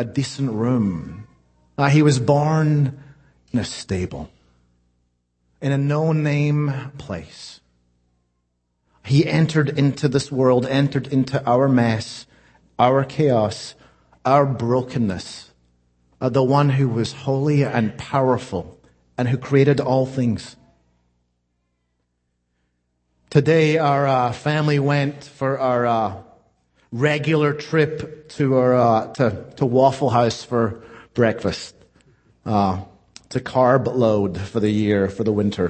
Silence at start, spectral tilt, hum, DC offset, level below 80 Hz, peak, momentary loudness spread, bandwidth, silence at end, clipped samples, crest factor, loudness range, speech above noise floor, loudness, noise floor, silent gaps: 0 s; -7 dB/octave; 60 Hz at -50 dBFS; under 0.1%; -54 dBFS; -2 dBFS; 15 LU; 8.8 kHz; 0 s; under 0.1%; 20 dB; 5 LU; 53 dB; -20 LUFS; -72 dBFS; none